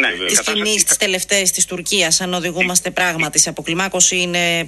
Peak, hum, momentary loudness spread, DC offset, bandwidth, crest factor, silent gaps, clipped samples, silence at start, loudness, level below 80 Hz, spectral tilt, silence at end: 0 dBFS; none; 5 LU; under 0.1%; 13 kHz; 18 dB; none; under 0.1%; 0 s; -15 LUFS; -50 dBFS; -1 dB/octave; 0 s